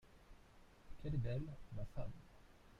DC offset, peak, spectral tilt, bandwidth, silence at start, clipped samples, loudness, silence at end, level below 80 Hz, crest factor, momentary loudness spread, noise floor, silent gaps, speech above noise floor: under 0.1%; -32 dBFS; -8.5 dB/octave; 10 kHz; 0.05 s; under 0.1%; -47 LUFS; 0 s; -56 dBFS; 16 dB; 24 LU; -64 dBFS; none; 21 dB